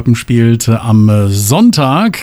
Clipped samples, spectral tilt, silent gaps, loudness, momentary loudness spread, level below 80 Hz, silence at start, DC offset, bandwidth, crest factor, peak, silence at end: under 0.1%; -6 dB/octave; none; -10 LUFS; 3 LU; -42 dBFS; 0 s; under 0.1%; 14.5 kHz; 8 dB; 0 dBFS; 0 s